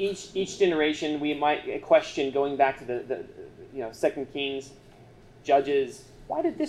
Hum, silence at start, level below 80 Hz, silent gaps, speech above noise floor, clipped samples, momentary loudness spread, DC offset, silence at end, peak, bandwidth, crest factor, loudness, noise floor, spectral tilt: none; 0 s; -60 dBFS; none; 25 dB; under 0.1%; 15 LU; under 0.1%; 0 s; -8 dBFS; 12.5 kHz; 18 dB; -27 LUFS; -51 dBFS; -4.5 dB/octave